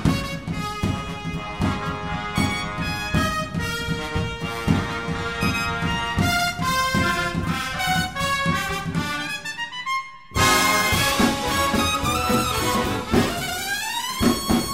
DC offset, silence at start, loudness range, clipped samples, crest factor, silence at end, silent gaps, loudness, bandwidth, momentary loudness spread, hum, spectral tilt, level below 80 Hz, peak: 0.4%; 0 s; 5 LU; under 0.1%; 18 dB; 0 s; none; -23 LUFS; 16.5 kHz; 9 LU; none; -4 dB/octave; -38 dBFS; -4 dBFS